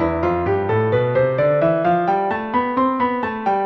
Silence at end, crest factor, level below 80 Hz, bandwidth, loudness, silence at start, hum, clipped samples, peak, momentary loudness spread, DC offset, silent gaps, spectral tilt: 0 s; 12 dB; -44 dBFS; 6.2 kHz; -19 LUFS; 0 s; none; under 0.1%; -6 dBFS; 4 LU; under 0.1%; none; -9.5 dB/octave